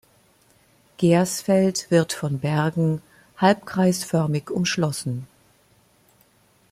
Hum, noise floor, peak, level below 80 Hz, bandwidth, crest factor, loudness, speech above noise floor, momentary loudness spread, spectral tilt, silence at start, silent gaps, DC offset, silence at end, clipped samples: none; -59 dBFS; -4 dBFS; -62 dBFS; 15.5 kHz; 20 dB; -22 LUFS; 38 dB; 6 LU; -5.5 dB/octave; 1 s; none; under 0.1%; 1.45 s; under 0.1%